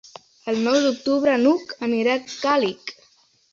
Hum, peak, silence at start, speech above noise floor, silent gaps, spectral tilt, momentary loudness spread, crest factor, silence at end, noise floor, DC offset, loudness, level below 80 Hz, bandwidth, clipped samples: none; -6 dBFS; 0.45 s; 38 dB; none; -4 dB/octave; 11 LU; 16 dB; 0.6 s; -59 dBFS; under 0.1%; -21 LUFS; -66 dBFS; 7.6 kHz; under 0.1%